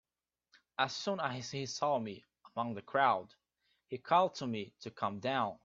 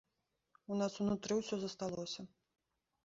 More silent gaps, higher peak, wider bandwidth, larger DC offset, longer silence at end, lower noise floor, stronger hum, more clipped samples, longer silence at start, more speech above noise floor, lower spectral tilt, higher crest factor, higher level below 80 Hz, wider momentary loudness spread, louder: neither; first, -14 dBFS vs -24 dBFS; about the same, 7.8 kHz vs 7.6 kHz; neither; second, 0.1 s vs 0.8 s; about the same, -89 dBFS vs -86 dBFS; neither; neither; about the same, 0.8 s vs 0.7 s; first, 54 dB vs 47 dB; about the same, -4.5 dB/octave vs -5.5 dB/octave; first, 22 dB vs 16 dB; second, -78 dBFS vs -72 dBFS; first, 15 LU vs 12 LU; first, -35 LUFS vs -40 LUFS